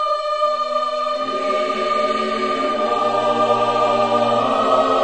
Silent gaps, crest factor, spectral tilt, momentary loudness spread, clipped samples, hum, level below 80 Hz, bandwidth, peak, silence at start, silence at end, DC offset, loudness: none; 16 dB; -4.5 dB/octave; 4 LU; under 0.1%; none; -58 dBFS; 9.2 kHz; -2 dBFS; 0 s; 0 s; 0.5%; -18 LUFS